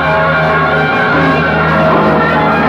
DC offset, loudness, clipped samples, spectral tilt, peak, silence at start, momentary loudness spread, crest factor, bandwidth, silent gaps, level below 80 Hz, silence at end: under 0.1%; -10 LUFS; under 0.1%; -7.5 dB/octave; 0 dBFS; 0 s; 1 LU; 10 dB; 7.6 kHz; none; -36 dBFS; 0 s